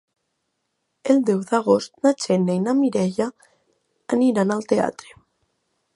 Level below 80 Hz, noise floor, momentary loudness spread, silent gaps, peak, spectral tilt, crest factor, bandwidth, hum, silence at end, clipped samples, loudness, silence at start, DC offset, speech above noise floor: -66 dBFS; -75 dBFS; 7 LU; none; -2 dBFS; -6.5 dB/octave; 20 dB; 11.5 kHz; none; 1.05 s; under 0.1%; -21 LUFS; 1.05 s; under 0.1%; 55 dB